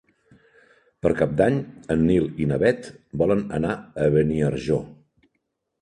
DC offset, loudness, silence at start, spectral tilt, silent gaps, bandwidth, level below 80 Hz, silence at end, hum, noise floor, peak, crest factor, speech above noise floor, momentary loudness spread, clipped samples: under 0.1%; -23 LUFS; 1.05 s; -8 dB/octave; none; 10.5 kHz; -46 dBFS; 0.9 s; none; -76 dBFS; -6 dBFS; 18 dB; 54 dB; 7 LU; under 0.1%